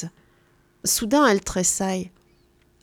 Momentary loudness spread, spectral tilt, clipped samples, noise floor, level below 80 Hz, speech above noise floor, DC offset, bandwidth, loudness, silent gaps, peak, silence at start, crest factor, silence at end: 15 LU; -3 dB/octave; under 0.1%; -60 dBFS; -48 dBFS; 39 dB; under 0.1%; 19 kHz; -21 LUFS; none; -4 dBFS; 0 s; 20 dB; 0.75 s